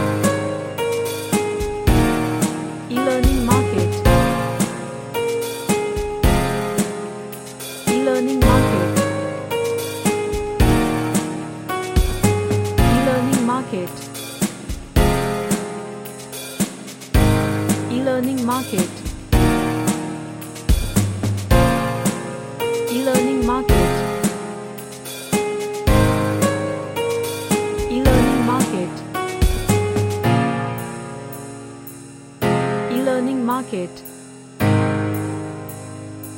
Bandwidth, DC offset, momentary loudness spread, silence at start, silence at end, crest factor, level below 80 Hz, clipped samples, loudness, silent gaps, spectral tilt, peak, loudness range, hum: 17 kHz; under 0.1%; 14 LU; 0 s; 0 s; 18 dB; -28 dBFS; under 0.1%; -20 LUFS; none; -5.5 dB/octave; 0 dBFS; 4 LU; none